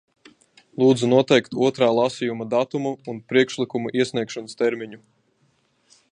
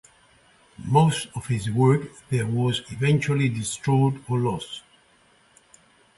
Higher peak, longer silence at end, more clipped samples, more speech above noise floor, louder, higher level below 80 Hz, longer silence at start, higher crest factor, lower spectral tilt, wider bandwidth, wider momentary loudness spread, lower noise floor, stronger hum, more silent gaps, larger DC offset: first, -2 dBFS vs -6 dBFS; second, 1.15 s vs 1.4 s; neither; first, 44 dB vs 37 dB; about the same, -21 LUFS vs -23 LUFS; second, -68 dBFS vs -54 dBFS; about the same, 0.8 s vs 0.8 s; about the same, 20 dB vs 18 dB; about the same, -5.5 dB/octave vs -6 dB/octave; about the same, 10.5 kHz vs 11.5 kHz; first, 13 LU vs 9 LU; first, -65 dBFS vs -59 dBFS; neither; neither; neither